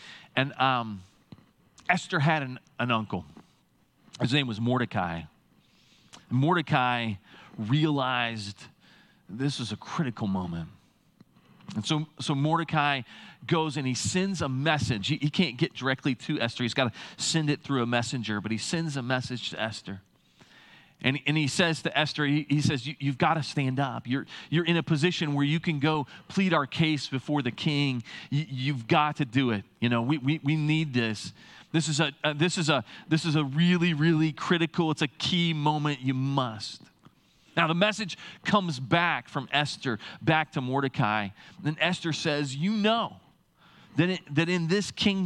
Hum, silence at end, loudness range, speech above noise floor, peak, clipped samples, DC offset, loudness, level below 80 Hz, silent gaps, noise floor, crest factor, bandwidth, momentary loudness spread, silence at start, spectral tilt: none; 0 s; 5 LU; 39 dB; -6 dBFS; under 0.1%; under 0.1%; -28 LUFS; -68 dBFS; none; -66 dBFS; 22 dB; 11.5 kHz; 9 LU; 0 s; -5 dB/octave